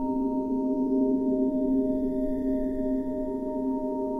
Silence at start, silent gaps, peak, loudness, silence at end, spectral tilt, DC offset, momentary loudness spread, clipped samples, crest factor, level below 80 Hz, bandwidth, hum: 0 s; none; -16 dBFS; -28 LUFS; 0 s; -10 dB/octave; under 0.1%; 5 LU; under 0.1%; 12 dB; -44 dBFS; 2.1 kHz; none